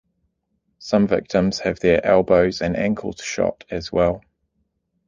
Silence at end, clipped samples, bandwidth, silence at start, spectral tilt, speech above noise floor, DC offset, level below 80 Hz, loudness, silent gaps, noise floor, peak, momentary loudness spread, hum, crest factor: 0.9 s; under 0.1%; 9.6 kHz; 0.8 s; -6 dB/octave; 52 dB; under 0.1%; -44 dBFS; -20 LUFS; none; -71 dBFS; -2 dBFS; 11 LU; none; 18 dB